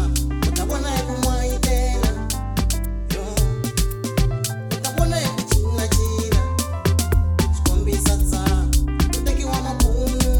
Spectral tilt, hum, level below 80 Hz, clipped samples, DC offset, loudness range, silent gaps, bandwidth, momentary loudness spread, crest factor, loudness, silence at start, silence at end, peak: -5 dB/octave; none; -22 dBFS; under 0.1%; under 0.1%; 3 LU; none; over 20 kHz; 4 LU; 16 dB; -21 LUFS; 0 s; 0 s; -4 dBFS